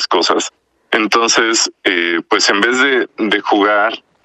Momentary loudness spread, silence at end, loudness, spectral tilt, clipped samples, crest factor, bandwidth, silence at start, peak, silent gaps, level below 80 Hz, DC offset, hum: 6 LU; 0.25 s; -13 LUFS; -1.5 dB/octave; under 0.1%; 14 dB; 13.5 kHz; 0 s; 0 dBFS; none; -62 dBFS; under 0.1%; none